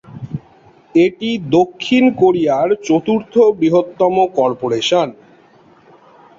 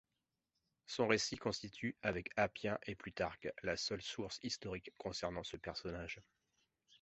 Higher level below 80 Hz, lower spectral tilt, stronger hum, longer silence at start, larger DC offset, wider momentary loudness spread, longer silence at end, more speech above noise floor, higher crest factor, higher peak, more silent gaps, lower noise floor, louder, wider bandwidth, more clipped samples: first, -56 dBFS vs -64 dBFS; first, -6 dB/octave vs -3 dB/octave; neither; second, 0.1 s vs 0.9 s; neither; about the same, 10 LU vs 11 LU; first, 1.25 s vs 0.05 s; second, 34 dB vs 48 dB; second, 14 dB vs 26 dB; first, -2 dBFS vs -18 dBFS; neither; second, -48 dBFS vs -90 dBFS; first, -15 LUFS vs -42 LUFS; about the same, 7.6 kHz vs 8 kHz; neither